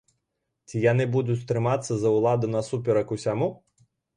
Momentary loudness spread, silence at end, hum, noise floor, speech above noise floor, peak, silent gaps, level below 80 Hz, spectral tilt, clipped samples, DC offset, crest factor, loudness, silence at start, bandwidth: 6 LU; 0.6 s; none; -80 dBFS; 56 dB; -8 dBFS; none; -60 dBFS; -7 dB/octave; under 0.1%; under 0.1%; 18 dB; -25 LUFS; 0.7 s; 10.5 kHz